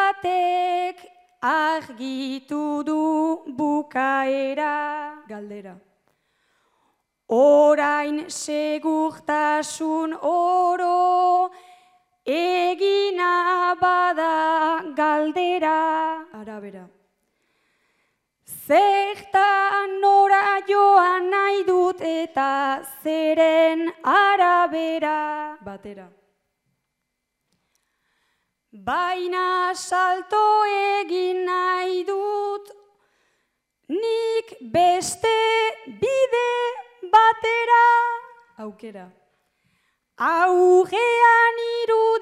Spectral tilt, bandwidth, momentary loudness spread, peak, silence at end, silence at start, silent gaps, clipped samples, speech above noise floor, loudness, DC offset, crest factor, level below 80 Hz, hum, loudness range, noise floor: -3 dB/octave; 15 kHz; 14 LU; -4 dBFS; 0 s; 0 s; none; under 0.1%; 58 dB; -20 LUFS; under 0.1%; 16 dB; -70 dBFS; none; 7 LU; -78 dBFS